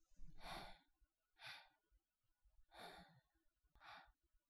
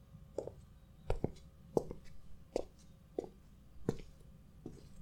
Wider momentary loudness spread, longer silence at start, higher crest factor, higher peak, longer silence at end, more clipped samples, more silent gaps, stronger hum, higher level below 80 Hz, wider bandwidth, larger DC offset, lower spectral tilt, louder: second, 10 LU vs 21 LU; about the same, 0 s vs 0 s; second, 20 dB vs 30 dB; second, -40 dBFS vs -14 dBFS; about the same, 0.1 s vs 0 s; neither; neither; neither; second, -70 dBFS vs -52 dBFS; second, 14 kHz vs 18 kHz; neither; second, -3 dB/octave vs -7.5 dB/octave; second, -60 LUFS vs -45 LUFS